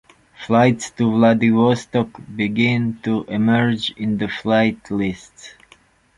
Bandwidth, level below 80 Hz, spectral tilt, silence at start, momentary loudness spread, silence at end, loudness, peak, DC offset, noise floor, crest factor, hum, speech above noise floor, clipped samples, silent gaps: 11 kHz; -52 dBFS; -6.5 dB/octave; 0.4 s; 8 LU; 0.65 s; -18 LUFS; -2 dBFS; under 0.1%; -53 dBFS; 16 dB; none; 35 dB; under 0.1%; none